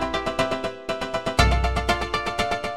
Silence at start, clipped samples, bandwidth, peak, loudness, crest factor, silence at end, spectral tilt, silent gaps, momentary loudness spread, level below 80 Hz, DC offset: 0 s; under 0.1%; 15 kHz; -2 dBFS; -24 LUFS; 22 dB; 0 s; -4.5 dB/octave; none; 8 LU; -30 dBFS; 0.6%